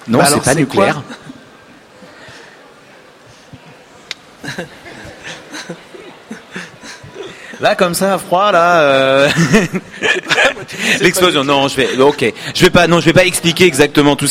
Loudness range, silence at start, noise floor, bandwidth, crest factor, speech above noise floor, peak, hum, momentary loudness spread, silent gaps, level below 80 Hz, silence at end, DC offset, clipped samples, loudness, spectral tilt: 20 LU; 0.05 s; -41 dBFS; 16.5 kHz; 14 dB; 30 dB; 0 dBFS; none; 21 LU; none; -42 dBFS; 0 s; under 0.1%; 0.1%; -11 LUFS; -4 dB/octave